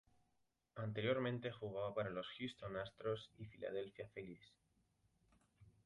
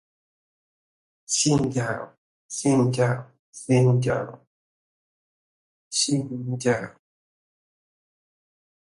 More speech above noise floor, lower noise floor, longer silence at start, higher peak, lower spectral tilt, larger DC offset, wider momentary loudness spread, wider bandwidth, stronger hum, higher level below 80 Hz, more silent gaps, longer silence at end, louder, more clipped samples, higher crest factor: second, 39 dB vs over 67 dB; second, -85 dBFS vs under -90 dBFS; second, 0.75 s vs 1.3 s; second, -26 dBFS vs -8 dBFS; first, -7 dB/octave vs -5 dB/octave; neither; about the same, 14 LU vs 16 LU; about the same, 11 kHz vs 11.5 kHz; neither; second, -74 dBFS vs -60 dBFS; second, none vs 2.17-2.49 s, 3.39-3.53 s, 4.47-5.91 s; second, 0.15 s vs 1.9 s; second, -46 LUFS vs -24 LUFS; neither; about the same, 22 dB vs 20 dB